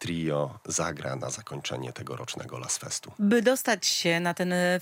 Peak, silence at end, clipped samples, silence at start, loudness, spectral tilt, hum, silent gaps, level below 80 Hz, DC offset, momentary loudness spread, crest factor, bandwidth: -8 dBFS; 0 s; under 0.1%; 0 s; -28 LUFS; -3.5 dB/octave; none; none; -68 dBFS; under 0.1%; 13 LU; 20 dB; 16.5 kHz